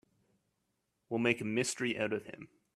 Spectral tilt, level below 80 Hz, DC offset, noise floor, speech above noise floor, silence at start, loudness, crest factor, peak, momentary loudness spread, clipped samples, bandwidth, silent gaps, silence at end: -4 dB/octave; -74 dBFS; under 0.1%; -82 dBFS; 48 dB; 1.1 s; -34 LUFS; 24 dB; -14 dBFS; 14 LU; under 0.1%; 14 kHz; none; 0.3 s